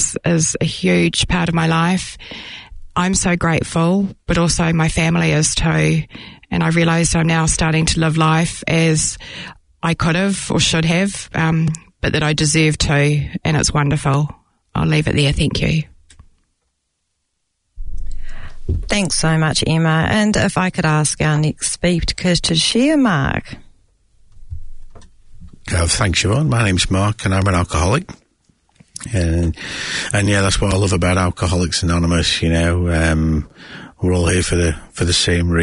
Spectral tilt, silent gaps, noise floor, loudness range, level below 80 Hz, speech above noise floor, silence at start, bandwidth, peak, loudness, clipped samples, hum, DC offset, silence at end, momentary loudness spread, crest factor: -4.5 dB/octave; none; -71 dBFS; 5 LU; -32 dBFS; 55 dB; 0 s; 11 kHz; -2 dBFS; -16 LUFS; under 0.1%; none; under 0.1%; 0 s; 14 LU; 14 dB